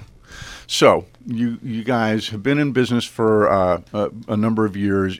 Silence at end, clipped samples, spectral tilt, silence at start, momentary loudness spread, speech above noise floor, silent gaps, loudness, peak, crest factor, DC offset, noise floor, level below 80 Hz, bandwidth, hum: 0 s; under 0.1%; -5.5 dB/octave; 0 s; 10 LU; 20 dB; none; -19 LUFS; 0 dBFS; 20 dB; under 0.1%; -39 dBFS; -50 dBFS; 15.5 kHz; none